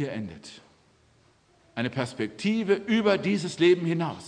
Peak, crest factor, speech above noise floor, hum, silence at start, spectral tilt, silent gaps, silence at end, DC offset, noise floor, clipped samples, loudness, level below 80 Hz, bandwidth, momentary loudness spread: -10 dBFS; 18 dB; 36 dB; none; 0 s; -6 dB/octave; none; 0 s; under 0.1%; -62 dBFS; under 0.1%; -26 LUFS; -68 dBFS; 10 kHz; 17 LU